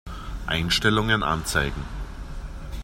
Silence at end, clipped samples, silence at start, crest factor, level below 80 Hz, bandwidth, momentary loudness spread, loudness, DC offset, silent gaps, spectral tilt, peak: 0 s; under 0.1%; 0.05 s; 20 dB; -34 dBFS; 16 kHz; 18 LU; -23 LUFS; under 0.1%; none; -4 dB/octave; -6 dBFS